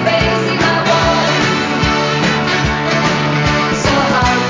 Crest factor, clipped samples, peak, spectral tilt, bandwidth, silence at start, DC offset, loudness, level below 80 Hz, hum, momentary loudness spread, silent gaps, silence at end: 12 dB; under 0.1%; -2 dBFS; -4.5 dB/octave; 7.6 kHz; 0 s; under 0.1%; -13 LUFS; -30 dBFS; none; 2 LU; none; 0 s